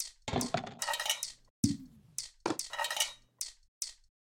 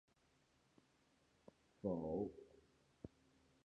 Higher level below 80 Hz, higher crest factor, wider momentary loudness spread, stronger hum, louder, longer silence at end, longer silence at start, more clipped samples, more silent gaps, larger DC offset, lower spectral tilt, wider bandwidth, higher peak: first, -62 dBFS vs -72 dBFS; about the same, 24 dB vs 22 dB; second, 10 LU vs 20 LU; neither; first, -36 LUFS vs -46 LUFS; second, 0.4 s vs 0.6 s; second, 0 s vs 1.85 s; neither; first, 1.50-1.63 s, 3.68-3.81 s vs none; neither; second, -2.5 dB/octave vs -9.5 dB/octave; first, 17 kHz vs 9.6 kHz; first, -12 dBFS vs -30 dBFS